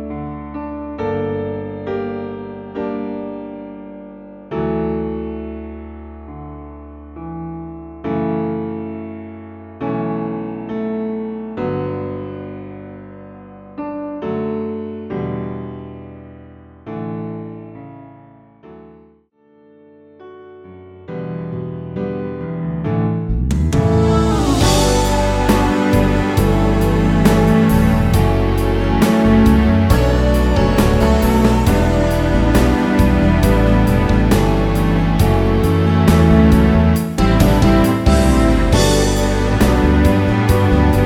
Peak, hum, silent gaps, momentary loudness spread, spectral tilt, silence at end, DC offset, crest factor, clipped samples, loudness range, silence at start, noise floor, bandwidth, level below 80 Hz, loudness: 0 dBFS; none; none; 20 LU; -6.5 dB/octave; 0 s; under 0.1%; 16 dB; under 0.1%; 15 LU; 0 s; -52 dBFS; 17 kHz; -22 dBFS; -16 LUFS